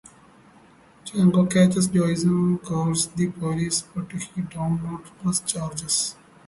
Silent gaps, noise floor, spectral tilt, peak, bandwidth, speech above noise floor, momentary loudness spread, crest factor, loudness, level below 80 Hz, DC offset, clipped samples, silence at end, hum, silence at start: none; -53 dBFS; -5 dB/octave; -6 dBFS; 11.5 kHz; 30 dB; 13 LU; 18 dB; -23 LUFS; -54 dBFS; under 0.1%; under 0.1%; 0.35 s; none; 1.05 s